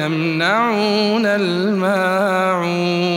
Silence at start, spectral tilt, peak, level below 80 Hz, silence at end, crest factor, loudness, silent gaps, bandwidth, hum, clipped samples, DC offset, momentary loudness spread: 0 s; -5.5 dB/octave; -4 dBFS; -72 dBFS; 0 s; 14 dB; -17 LUFS; none; 16.5 kHz; none; under 0.1%; under 0.1%; 2 LU